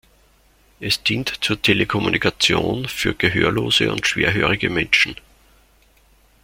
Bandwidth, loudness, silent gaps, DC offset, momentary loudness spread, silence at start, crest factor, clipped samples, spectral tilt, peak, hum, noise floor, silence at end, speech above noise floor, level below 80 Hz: 16.5 kHz; -18 LUFS; none; under 0.1%; 6 LU; 0.8 s; 20 dB; under 0.1%; -4 dB/octave; -2 dBFS; none; -55 dBFS; 1.3 s; 36 dB; -44 dBFS